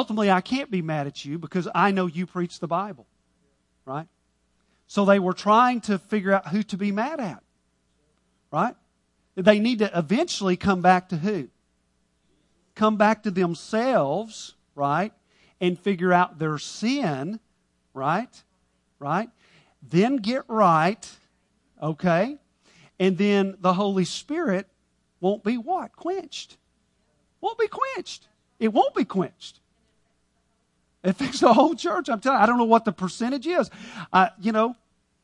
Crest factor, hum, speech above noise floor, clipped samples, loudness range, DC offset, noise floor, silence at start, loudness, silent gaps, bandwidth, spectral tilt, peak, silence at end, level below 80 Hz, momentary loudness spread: 24 dB; 60 Hz at -55 dBFS; 47 dB; under 0.1%; 7 LU; under 0.1%; -70 dBFS; 0 s; -24 LUFS; none; 11 kHz; -6 dB/octave; -2 dBFS; 0.5 s; -64 dBFS; 15 LU